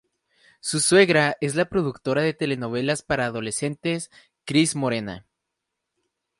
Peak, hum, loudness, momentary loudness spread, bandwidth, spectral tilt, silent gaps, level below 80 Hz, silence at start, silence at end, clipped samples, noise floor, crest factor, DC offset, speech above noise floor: -4 dBFS; none; -23 LUFS; 14 LU; 11.5 kHz; -4 dB/octave; none; -56 dBFS; 0.65 s; 1.2 s; under 0.1%; -82 dBFS; 20 dB; under 0.1%; 59 dB